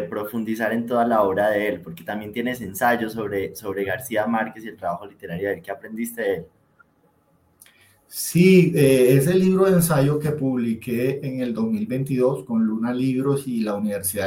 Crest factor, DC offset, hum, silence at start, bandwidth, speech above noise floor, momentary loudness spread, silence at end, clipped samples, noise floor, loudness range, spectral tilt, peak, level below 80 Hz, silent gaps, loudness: 18 dB; under 0.1%; none; 0 s; 17 kHz; 41 dB; 14 LU; 0 s; under 0.1%; -62 dBFS; 11 LU; -6 dB/octave; -4 dBFS; -56 dBFS; none; -22 LUFS